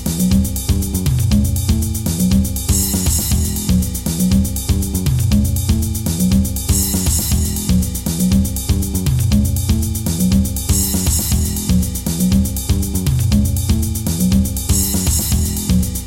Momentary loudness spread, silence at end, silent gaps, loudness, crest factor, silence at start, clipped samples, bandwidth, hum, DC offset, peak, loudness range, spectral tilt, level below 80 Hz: 3 LU; 0 s; none; -16 LUFS; 14 dB; 0 s; under 0.1%; 17 kHz; none; under 0.1%; -2 dBFS; 0 LU; -5 dB/octave; -22 dBFS